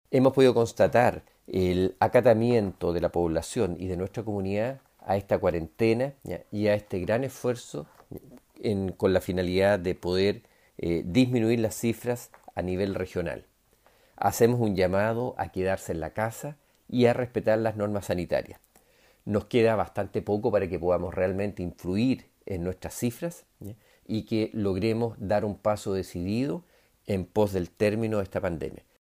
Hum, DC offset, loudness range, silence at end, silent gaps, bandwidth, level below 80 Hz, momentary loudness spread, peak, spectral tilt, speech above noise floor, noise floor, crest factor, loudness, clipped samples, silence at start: none; under 0.1%; 4 LU; 0.25 s; none; 15.5 kHz; -54 dBFS; 13 LU; -8 dBFS; -6.5 dB/octave; 37 dB; -63 dBFS; 20 dB; -27 LUFS; under 0.1%; 0.1 s